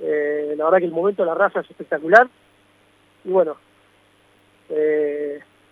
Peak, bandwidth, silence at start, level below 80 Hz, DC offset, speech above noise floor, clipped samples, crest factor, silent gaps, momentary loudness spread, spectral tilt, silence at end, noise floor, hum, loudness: 0 dBFS; 10.5 kHz; 0 s; -74 dBFS; under 0.1%; 38 dB; under 0.1%; 20 dB; none; 15 LU; -6.5 dB/octave; 0.3 s; -57 dBFS; none; -19 LUFS